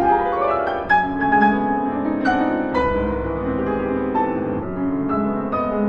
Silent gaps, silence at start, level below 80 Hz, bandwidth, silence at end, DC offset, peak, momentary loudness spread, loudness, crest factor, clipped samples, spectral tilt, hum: none; 0 s; -38 dBFS; 6.6 kHz; 0 s; under 0.1%; -4 dBFS; 6 LU; -20 LUFS; 16 dB; under 0.1%; -8.5 dB/octave; none